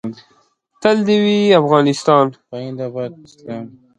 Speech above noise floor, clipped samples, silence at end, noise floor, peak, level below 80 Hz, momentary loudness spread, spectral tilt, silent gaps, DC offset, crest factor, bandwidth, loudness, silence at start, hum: 43 dB; under 0.1%; 0.3 s; -58 dBFS; 0 dBFS; -62 dBFS; 18 LU; -6 dB/octave; none; under 0.1%; 16 dB; 11 kHz; -15 LUFS; 0.05 s; none